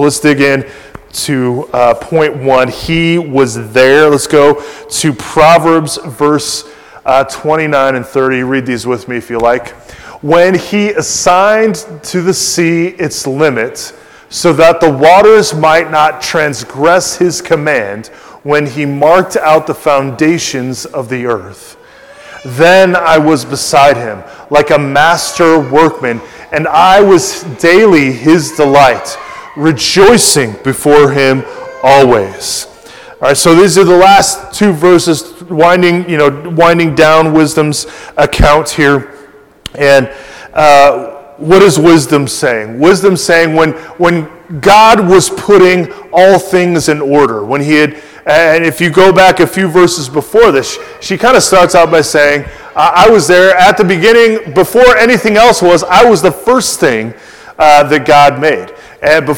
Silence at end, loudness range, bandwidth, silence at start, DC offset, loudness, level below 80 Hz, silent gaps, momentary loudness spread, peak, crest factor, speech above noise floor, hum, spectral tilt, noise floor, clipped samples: 0 s; 5 LU; over 20 kHz; 0 s; 0.7%; -8 LUFS; -34 dBFS; none; 12 LU; 0 dBFS; 8 dB; 29 dB; none; -4.5 dB/octave; -37 dBFS; 7%